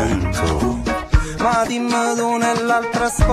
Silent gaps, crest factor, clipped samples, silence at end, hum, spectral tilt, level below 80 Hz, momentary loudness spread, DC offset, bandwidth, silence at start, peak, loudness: none; 16 dB; under 0.1%; 0 s; none; -5 dB/octave; -24 dBFS; 3 LU; under 0.1%; 14 kHz; 0 s; 0 dBFS; -19 LUFS